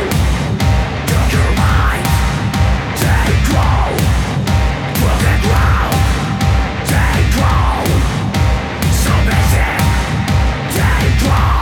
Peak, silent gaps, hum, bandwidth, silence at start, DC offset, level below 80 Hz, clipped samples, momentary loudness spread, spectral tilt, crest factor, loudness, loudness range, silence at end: -2 dBFS; none; none; 18.5 kHz; 0 s; under 0.1%; -16 dBFS; under 0.1%; 3 LU; -5.5 dB/octave; 12 dB; -14 LUFS; 1 LU; 0 s